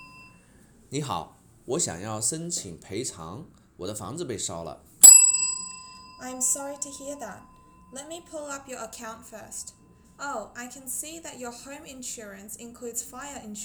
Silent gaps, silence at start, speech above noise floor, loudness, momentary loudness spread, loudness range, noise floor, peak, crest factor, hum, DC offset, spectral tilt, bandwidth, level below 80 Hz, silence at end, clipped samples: none; 0 s; 21 dB; -19 LUFS; 17 LU; 20 LU; -56 dBFS; 0 dBFS; 26 dB; none; under 0.1%; -1 dB/octave; over 20 kHz; -62 dBFS; 0 s; under 0.1%